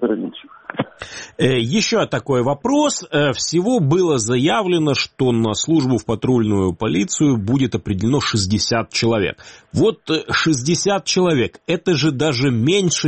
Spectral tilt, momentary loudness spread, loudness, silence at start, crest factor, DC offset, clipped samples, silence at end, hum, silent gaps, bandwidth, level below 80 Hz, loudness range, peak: -5 dB/octave; 7 LU; -18 LUFS; 0 s; 16 dB; 0.1%; under 0.1%; 0 s; none; none; 8.8 kHz; -48 dBFS; 1 LU; 0 dBFS